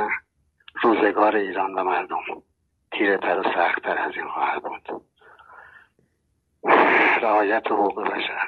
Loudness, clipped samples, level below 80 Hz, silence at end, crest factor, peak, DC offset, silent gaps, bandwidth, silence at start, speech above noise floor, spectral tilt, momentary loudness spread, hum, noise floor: -21 LUFS; under 0.1%; -66 dBFS; 0 s; 20 dB; -2 dBFS; under 0.1%; none; 6.4 kHz; 0 s; 48 dB; -6 dB/octave; 16 LU; none; -70 dBFS